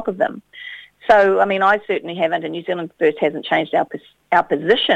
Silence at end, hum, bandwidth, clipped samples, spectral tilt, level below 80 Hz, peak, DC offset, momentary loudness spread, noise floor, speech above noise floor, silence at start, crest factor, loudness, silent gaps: 0 s; none; 9 kHz; under 0.1%; -6 dB/octave; -58 dBFS; 0 dBFS; under 0.1%; 17 LU; -37 dBFS; 19 dB; 0 s; 18 dB; -18 LUFS; none